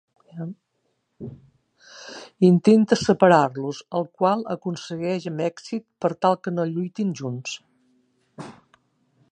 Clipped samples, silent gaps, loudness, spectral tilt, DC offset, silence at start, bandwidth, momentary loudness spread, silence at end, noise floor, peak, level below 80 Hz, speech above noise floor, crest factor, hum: under 0.1%; none; -22 LUFS; -6.5 dB/octave; under 0.1%; 0.35 s; 9.4 kHz; 24 LU; 0.8 s; -73 dBFS; -2 dBFS; -64 dBFS; 52 dB; 22 dB; none